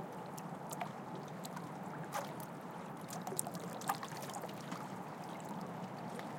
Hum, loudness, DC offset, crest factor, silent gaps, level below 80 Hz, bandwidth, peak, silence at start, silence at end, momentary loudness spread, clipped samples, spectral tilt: none; -45 LUFS; under 0.1%; 30 dB; none; -84 dBFS; 17 kHz; -14 dBFS; 0 s; 0 s; 6 LU; under 0.1%; -4.5 dB/octave